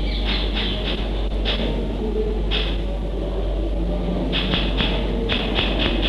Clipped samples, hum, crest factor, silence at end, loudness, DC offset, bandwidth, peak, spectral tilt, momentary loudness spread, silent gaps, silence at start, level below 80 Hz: under 0.1%; none; 18 dB; 0 s; -23 LUFS; under 0.1%; 6.4 kHz; -4 dBFS; -6.5 dB/octave; 5 LU; none; 0 s; -24 dBFS